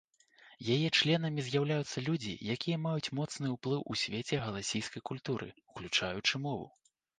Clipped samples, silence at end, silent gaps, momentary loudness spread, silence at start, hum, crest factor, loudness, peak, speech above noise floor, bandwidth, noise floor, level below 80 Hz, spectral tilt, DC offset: under 0.1%; 0.5 s; none; 11 LU; 0.45 s; none; 20 dB; -34 LUFS; -14 dBFS; 28 dB; 9.8 kHz; -62 dBFS; -66 dBFS; -4.5 dB/octave; under 0.1%